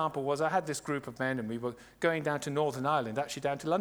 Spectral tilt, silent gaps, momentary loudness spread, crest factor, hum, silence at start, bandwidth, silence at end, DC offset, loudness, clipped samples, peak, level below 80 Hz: -5 dB/octave; none; 6 LU; 16 dB; none; 0 s; over 20 kHz; 0 s; under 0.1%; -33 LUFS; under 0.1%; -16 dBFS; -68 dBFS